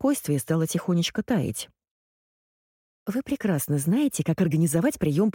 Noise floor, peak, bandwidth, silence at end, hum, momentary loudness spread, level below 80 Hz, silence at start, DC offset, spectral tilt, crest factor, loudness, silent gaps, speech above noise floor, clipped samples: under -90 dBFS; -12 dBFS; 17 kHz; 0.05 s; none; 8 LU; -58 dBFS; 0 s; under 0.1%; -6 dB/octave; 14 dB; -25 LUFS; 1.91-3.06 s; over 66 dB; under 0.1%